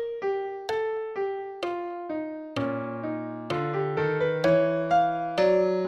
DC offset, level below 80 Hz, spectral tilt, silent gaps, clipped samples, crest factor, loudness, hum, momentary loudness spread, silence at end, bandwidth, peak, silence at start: under 0.1%; -64 dBFS; -7 dB/octave; none; under 0.1%; 16 dB; -27 LUFS; none; 11 LU; 0 s; 10.5 kHz; -12 dBFS; 0 s